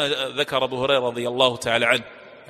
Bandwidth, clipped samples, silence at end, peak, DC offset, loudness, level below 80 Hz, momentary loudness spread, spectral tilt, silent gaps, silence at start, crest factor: 14 kHz; under 0.1%; 0.05 s; -2 dBFS; under 0.1%; -21 LUFS; -58 dBFS; 4 LU; -3.5 dB/octave; none; 0 s; 20 dB